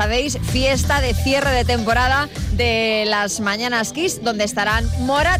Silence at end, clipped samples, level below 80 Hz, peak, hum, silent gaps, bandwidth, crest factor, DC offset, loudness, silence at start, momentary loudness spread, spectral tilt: 0 s; under 0.1%; -28 dBFS; -8 dBFS; none; none; 16 kHz; 10 dB; under 0.1%; -18 LUFS; 0 s; 4 LU; -4 dB/octave